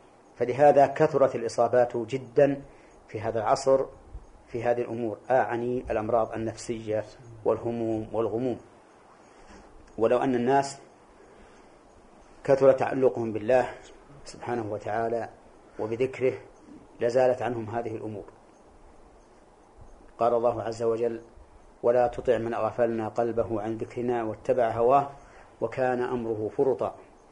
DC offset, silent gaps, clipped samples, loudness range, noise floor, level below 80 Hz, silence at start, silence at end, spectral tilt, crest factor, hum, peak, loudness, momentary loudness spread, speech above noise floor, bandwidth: under 0.1%; none; under 0.1%; 5 LU; -55 dBFS; -56 dBFS; 0.4 s; 0.3 s; -6.5 dB/octave; 20 dB; none; -8 dBFS; -27 LUFS; 14 LU; 29 dB; 10.5 kHz